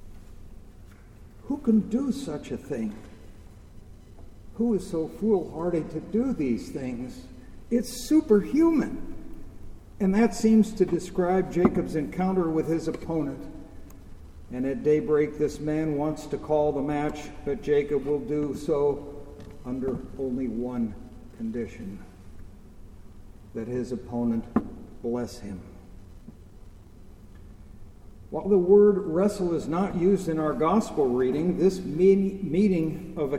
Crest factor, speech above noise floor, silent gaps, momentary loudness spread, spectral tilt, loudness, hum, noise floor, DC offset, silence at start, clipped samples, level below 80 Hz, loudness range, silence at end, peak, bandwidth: 20 dB; 23 dB; none; 18 LU; -7.5 dB/octave; -26 LUFS; none; -48 dBFS; under 0.1%; 0 s; under 0.1%; -46 dBFS; 10 LU; 0 s; -6 dBFS; 15 kHz